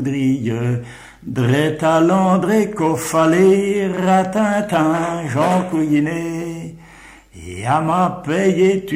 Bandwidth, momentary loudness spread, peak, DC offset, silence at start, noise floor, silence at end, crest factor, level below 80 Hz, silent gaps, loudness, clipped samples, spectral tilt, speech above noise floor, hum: 16 kHz; 13 LU; -4 dBFS; under 0.1%; 0 s; -43 dBFS; 0 s; 14 dB; -50 dBFS; none; -17 LUFS; under 0.1%; -6.5 dB/octave; 26 dB; none